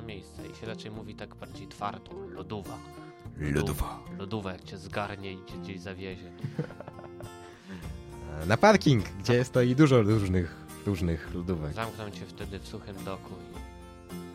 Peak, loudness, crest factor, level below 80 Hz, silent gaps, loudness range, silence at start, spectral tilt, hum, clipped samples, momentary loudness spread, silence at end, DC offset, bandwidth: -8 dBFS; -30 LUFS; 24 dB; -48 dBFS; none; 14 LU; 0 s; -6.5 dB/octave; none; under 0.1%; 22 LU; 0 s; under 0.1%; 16 kHz